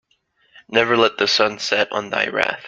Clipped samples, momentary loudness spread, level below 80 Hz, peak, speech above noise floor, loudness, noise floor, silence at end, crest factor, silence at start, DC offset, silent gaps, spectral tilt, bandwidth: under 0.1%; 5 LU; -62 dBFS; 0 dBFS; 44 dB; -18 LUFS; -63 dBFS; 0 s; 20 dB; 0.7 s; under 0.1%; none; -3 dB/octave; 9 kHz